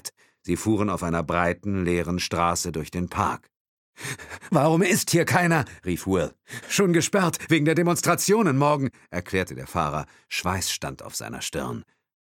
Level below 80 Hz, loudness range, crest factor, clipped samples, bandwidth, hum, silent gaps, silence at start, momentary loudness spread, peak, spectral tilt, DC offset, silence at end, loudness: -50 dBFS; 5 LU; 20 dB; under 0.1%; 17.5 kHz; none; 3.60-3.93 s; 0.05 s; 13 LU; -4 dBFS; -4.5 dB/octave; under 0.1%; 0.4 s; -24 LUFS